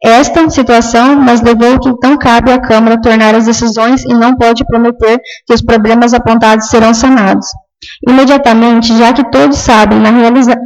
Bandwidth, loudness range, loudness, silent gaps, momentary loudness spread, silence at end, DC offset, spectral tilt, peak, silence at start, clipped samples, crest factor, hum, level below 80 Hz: 9.8 kHz; 1 LU; -6 LUFS; none; 4 LU; 0 s; under 0.1%; -4.5 dB/octave; 0 dBFS; 0 s; 0.4%; 6 dB; none; -28 dBFS